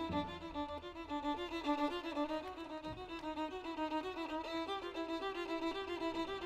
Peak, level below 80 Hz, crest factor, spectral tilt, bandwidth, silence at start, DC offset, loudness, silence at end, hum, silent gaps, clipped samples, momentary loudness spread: -26 dBFS; -62 dBFS; 16 dB; -5 dB/octave; 13.5 kHz; 0 s; under 0.1%; -41 LUFS; 0 s; none; none; under 0.1%; 7 LU